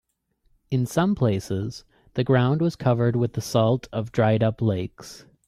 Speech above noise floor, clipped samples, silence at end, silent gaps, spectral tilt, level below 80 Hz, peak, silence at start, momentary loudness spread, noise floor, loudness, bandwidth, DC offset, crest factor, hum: 45 dB; under 0.1%; 0.3 s; none; -7 dB/octave; -54 dBFS; -6 dBFS; 0.7 s; 13 LU; -67 dBFS; -23 LUFS; 14.5 kHz; under 0.1%; 16 dB; none